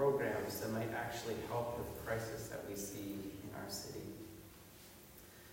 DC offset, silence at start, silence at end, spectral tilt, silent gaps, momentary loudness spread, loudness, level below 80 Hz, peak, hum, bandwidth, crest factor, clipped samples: under 0.1%; 0 s; 0 s; -5 dB/octave; none; 17 LU; -42 LUFS; -64 dBFS; -22 dBFS; none; 16 kHz; 20 dB; under 0.1%